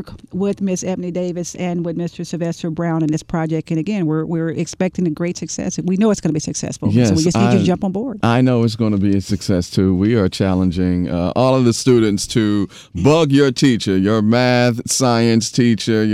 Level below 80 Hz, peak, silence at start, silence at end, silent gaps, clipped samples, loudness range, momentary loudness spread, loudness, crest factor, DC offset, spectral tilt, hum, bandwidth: -46 dBFS; -2 dBFS; 0 s; 0 s; none; under 0.1%; 6 LU; 8 LU; -17 LUFS; 14 dB; under 0.1%; -6 dB/octave; none; 14.5 kHz